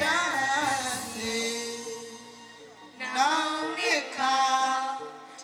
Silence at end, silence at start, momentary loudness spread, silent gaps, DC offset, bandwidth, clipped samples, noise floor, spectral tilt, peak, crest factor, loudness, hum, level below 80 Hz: 0 s; 0 s; 19 LU; none; under 0.1%; 18 kHz; under 0.1%; -49 dBFS; -1 dB/octave; -12 dBFS; 18 dB; -27 LUFS; none; -66 dBFS